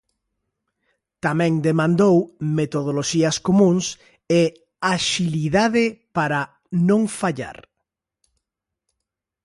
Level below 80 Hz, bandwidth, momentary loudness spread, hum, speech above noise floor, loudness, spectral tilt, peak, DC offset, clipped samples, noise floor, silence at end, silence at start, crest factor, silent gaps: -56 dBFS; 11.5 kHz; 9 LU; none; 64 dB; -20 LUFS; -5.5 dB/octave; -6 dBFS; under 0.1%; under 0.1%; -83 dBFS; 1.95 s; 1.25 s; 16 dB; none